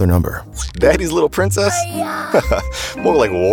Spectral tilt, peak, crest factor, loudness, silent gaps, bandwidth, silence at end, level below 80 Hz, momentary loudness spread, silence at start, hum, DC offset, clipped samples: -5 dB/octave; -2 dBFS; 14 dB; -17 LUFS; none; 19 kHz; 0 s; -30 dBFS; 9 LU; 0 s; none; under 0.1%; under 0.1%